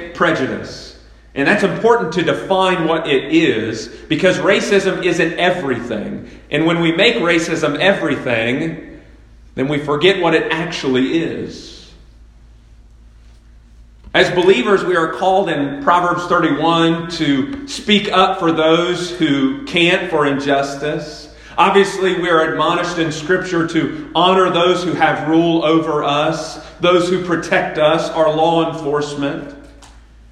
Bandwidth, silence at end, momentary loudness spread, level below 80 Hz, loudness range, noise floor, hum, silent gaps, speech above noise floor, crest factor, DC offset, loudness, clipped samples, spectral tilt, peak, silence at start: 11.5 kHz; 0.3 s; 10 LU; -46 dBFS; 3 LU; -43 dBFS; none; none; 28 dB; 16 dB; under 0.1%; -15 LUFS; under 0.1%; -5 dB/octave; 0 dBFS; 0 s